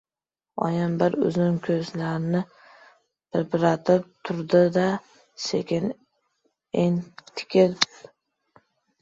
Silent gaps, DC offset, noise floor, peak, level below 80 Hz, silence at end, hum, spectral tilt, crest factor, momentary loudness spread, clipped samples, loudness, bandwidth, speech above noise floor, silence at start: none; under 0.1%; under -90 dBFS; -2 dBFS; -64 dBFS; 1.15 s; none; -6 dB/octave; 24 dB; 12 LU; under 0.1%; -24 LUFS; 7.8 kHz; over 67 dB; 0.55 s